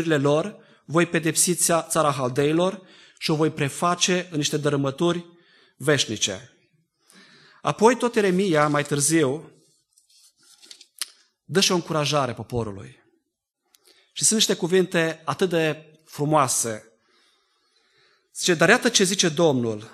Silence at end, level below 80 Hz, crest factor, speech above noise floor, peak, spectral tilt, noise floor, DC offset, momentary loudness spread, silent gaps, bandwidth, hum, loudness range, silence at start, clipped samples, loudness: 0.05 s; -64 dBFS; 22 dB; 56 dB; -2 dBFS; -3.5 dB/octave; -78 dBFS; under 0.1%; 14 LU; none; 13 kHz; none; 4 LU; 0 s; under 0.1%; -22 LUFS